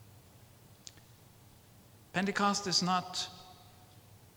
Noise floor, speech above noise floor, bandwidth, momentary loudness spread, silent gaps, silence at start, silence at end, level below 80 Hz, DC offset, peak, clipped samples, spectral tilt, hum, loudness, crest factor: -59 dBFS; 27 dB; over 20 kHz; 23 LU; none; 0 s; 0.2 s; -70 dBFS; under 0.1%; -14 dBFS; under 0.1%; -3 dB/octave; none; -32 LUFS; 24 dB